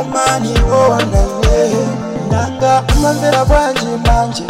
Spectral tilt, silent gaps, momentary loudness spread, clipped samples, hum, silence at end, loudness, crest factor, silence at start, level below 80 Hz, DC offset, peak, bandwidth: -5 dB/octave; none; 5 LU; under 0.1%; none; 0 s; -13 LUFS; 10 dB; 0 s; -18 dBFS; under 0.1%; -2 dBFS; 16 kHz